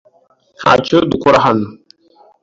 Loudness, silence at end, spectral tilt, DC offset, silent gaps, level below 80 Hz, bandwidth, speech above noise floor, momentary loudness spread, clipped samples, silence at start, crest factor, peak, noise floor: -12 LUFS; 0.7 s; -6 dB/octave; under 0.1%; none; -46 dBFS; 7.8 kHz; 42 dB; 8 LU; under 0.1%; 0.6 s; 14 dB; 0 dBFS; -54 dBFS